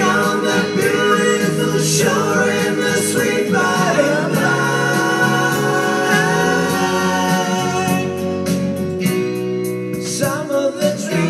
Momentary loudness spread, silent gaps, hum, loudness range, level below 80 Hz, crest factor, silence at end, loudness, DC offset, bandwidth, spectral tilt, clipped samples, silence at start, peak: 5 LU; none; none; 4 LU; -56 dBFS; 14 dB; 0 s; -16 LUFS; under 0.1%; 15.5 kHz; -4.5 dB/octave; under 0.1%; 0 s; -2 dBFS